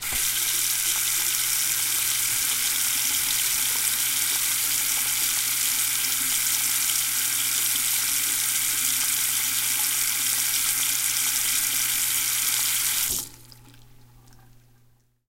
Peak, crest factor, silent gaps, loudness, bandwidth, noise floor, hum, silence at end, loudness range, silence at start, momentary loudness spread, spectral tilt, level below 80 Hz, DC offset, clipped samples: -6 dBFS; 18 dB; none; -21 LUFS; 17 kHz; -60 dBFS; none; 1 s; 1 LU; 0 s; 1 LU; 2 dB/octave; -56 dBFS; under 0.1%; under 0.1%